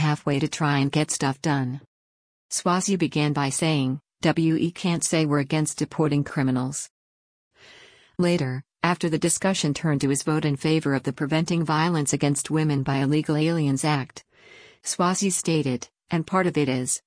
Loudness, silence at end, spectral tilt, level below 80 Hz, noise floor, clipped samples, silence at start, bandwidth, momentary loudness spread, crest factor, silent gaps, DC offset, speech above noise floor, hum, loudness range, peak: -24 LUFS; 0.1 s; -5 dB/octave; -60 dBFS; -52 dBFS; under 0.1%; 0 s; 10.5 kHz; 7 LU; 18 dB; 1.87-2.49 s, 6.90-7.51 s; under 0.1%; 28 dB; none; 3 LU; -6 dBFS